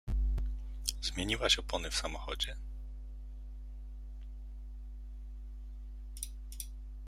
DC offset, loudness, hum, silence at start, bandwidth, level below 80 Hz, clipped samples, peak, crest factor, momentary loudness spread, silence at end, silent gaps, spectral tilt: under 0.1%; -36 LUFS; none; 0.05 s; 15.5 kHz; -40 dBFS; under 0.1%; -10 dBFS; 28 dB; 18 LU; 0 s; none; -3 dB/octave